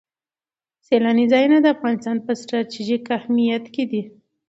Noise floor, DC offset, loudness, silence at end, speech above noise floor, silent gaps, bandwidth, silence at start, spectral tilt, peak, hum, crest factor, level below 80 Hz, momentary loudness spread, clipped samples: under -90 dBFS; under 0.1%; -20 LUFS; 0.4 s; over 71 dB; none; 7.8 kHz; 0.9 s; -6 dB/octave; -4 dBFS; none; 16 dB; -70 dBFS; 10 LU; under 0.1%